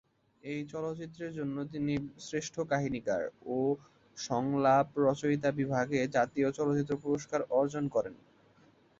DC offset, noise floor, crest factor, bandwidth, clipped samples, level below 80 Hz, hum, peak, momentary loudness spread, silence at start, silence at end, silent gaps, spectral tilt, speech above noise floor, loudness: under 0.1%; -64 dBFS; 18 dB; 7.8 kHz; under 0.1%; -66 dBFS; none; -14 dBFS; 10 LU; 0.45 s; 0.85 s; none; -6 dB/octave; 32 dB; -32 LUFS